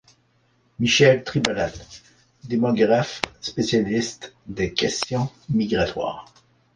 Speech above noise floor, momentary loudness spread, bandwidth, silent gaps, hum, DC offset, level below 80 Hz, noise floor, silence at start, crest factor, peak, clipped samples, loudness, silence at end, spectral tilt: 41 dB; 13 LU; 9.8 kHz; none; none; under 0.1%; -50 dBFS; -63 dBFS; 0.8 s; 20 dB; -2 dBFS; under 0.1%; -22 LUFS; 0.5 s; -4.5 dB/octave